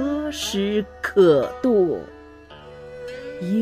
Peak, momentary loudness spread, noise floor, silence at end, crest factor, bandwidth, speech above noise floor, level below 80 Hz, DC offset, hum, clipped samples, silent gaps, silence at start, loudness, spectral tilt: -4 dBFS; 23 LU; -43 dBFS; 0 s; 16 dB; 15.5 kHz; 24 dB; -48 dBFS; under 0.1%; 50 Hz at -50 dBFS; under 0.1%; none; 0 s; -21 LUFS; -5.5 dB/octave